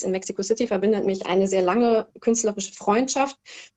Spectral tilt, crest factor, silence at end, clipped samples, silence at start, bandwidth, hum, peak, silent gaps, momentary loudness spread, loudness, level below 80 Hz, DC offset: -4.5 dB/octave; 16 dB; 0.1 s; under 0.1%; 0 s; 9.2 kHz; none; -6 dBFS; none; 7 LU; -23 LUFS; -62 dBFS; under 0.1%